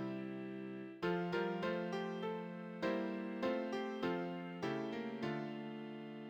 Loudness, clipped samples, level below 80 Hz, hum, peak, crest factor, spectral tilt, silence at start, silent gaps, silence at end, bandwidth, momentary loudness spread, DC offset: -42 LUFS; under 0.1%; -78 dBFS; none; -26 dBFS; 16 dB; -7 dB/octave; 0 s; none; 0 s; 18.5 kHz; 8 LU; under 0.1%